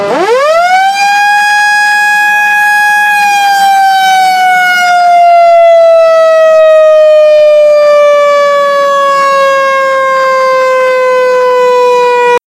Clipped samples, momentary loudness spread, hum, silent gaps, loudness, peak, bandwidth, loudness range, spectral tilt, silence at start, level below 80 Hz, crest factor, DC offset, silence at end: 2%; 4 LU; none; none; -5 LUFS; 0 dBFS; 16 kHz; 3 LU; -1 dB/octave; 0 s; -58 dBFS; 6 dB; under 0.1%; 0.1 s